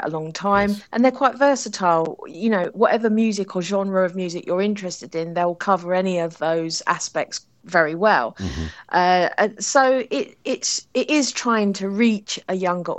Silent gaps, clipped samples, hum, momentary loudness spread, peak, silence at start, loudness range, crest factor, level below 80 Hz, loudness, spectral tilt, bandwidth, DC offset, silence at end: none; under 0.1%; none; 9 LU; -2 dBFS; 0 s; 3 LU; 18 dB; -50 dBFS; -21 LUFS; -4 dB/octave; 8.8 kHz; under 0.1%; 0 s